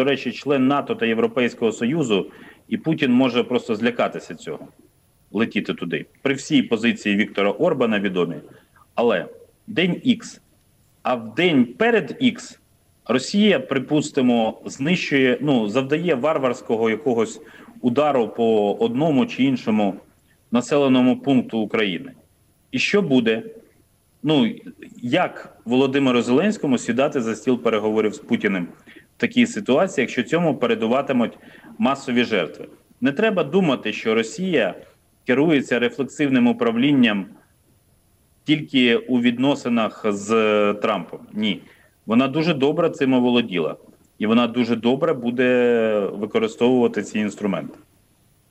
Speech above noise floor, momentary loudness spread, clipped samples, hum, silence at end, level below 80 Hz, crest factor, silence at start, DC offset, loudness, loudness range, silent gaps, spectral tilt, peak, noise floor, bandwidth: 39 dB; 10 LU; under 0.1%; none; 0.75 s; -66 dBFS; 16 dB; 0 s; under 0.1%; -20 LUFS; 3 LU; none; -5.5 dB/octave; -4 dBFS; -59 dBFS; 10.5 kHz